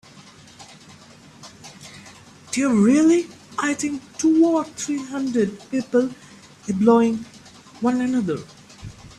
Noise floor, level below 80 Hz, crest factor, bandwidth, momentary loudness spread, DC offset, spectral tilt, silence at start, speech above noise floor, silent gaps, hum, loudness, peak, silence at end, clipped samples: -46 dBFS; -60 dBFS; 18 dB; 12 kHz; 24 LU; under 0.1%; -5.5 dB/octave; 0.6 s; 27 dB; none; none; -21 LUFS; -4 dBFS; 0.1 s; under 0.1%